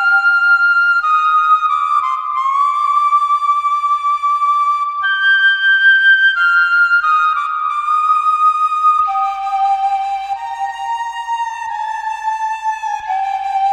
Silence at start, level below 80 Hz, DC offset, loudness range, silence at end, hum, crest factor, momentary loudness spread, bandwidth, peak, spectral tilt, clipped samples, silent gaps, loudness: 0 s; -58 dBFS; under 0.1%; 8 LU; 0 s; none; 12 dB; 11 LU; 10 kHz; -2 dBFS; 3 dB/octave; under 0.1%; none; -13 LUFS